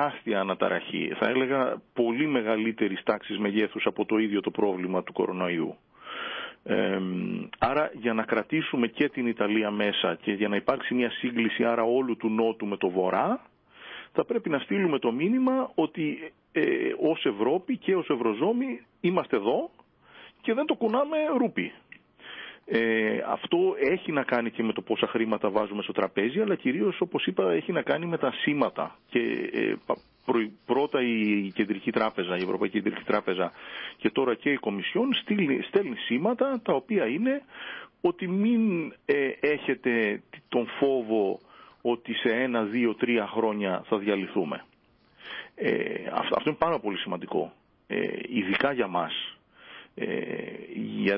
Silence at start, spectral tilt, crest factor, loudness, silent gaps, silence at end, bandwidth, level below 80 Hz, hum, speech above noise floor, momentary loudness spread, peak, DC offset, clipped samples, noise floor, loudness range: 0 s; -10 dB/octave; 18 dB; -28 LUFS; none; 0 s; 5.6 kHz; -68 dBFS; none; 36 dB; 8 LU; -10 dBFS; under 0.1%; under 0.1%; -63 dBFS; 3 LU